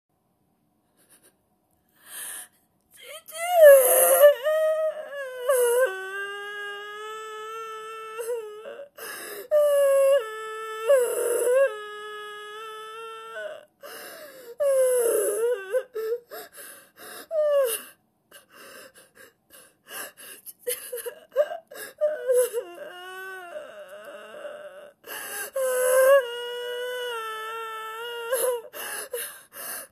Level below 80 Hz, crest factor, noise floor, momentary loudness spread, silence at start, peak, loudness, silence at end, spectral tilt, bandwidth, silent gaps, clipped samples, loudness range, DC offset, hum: -82 dBFS; 24 dB; -70 dBFS; 22 LU; 2.05 s; -2 dBFS; -24 LUFS; 0.05 s; 0.5 dB/octave; 14 kHz; none; under 0.1%; 15 LU; under 0.1%; none